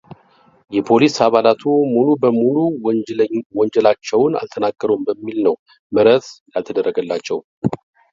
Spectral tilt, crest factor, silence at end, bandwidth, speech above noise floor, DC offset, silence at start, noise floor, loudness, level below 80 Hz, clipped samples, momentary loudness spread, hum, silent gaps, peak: -6 dB/octave; 16 dB; 0.35 s; 7.6 kHz; 37 dB; under 0.1%; 0.7 s; -53 dBFS; -17 LUFS; -60 dBFS; under 0.1%; 10 LU; none; 3.46-3.50 s, 5.59-5.66 s, 5.79-5.90 s, 6.41-6.46 s, 7.44-7.62 s; 0 dBFS